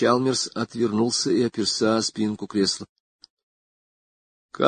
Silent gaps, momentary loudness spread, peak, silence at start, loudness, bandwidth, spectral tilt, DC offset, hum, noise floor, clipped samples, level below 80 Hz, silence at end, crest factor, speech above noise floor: 2.89-3.19 s, 3.30-3.37 s, 3.43-4.49 s; 6 LU; -2 dBFS; 0 s; -23 LUFS; 9.6 kHz; -4 dB/octave; under 0.1%; none; under -90 dBFS; under 0.1%; -62 dBFS; 0 s; 22 dB; over 67 dB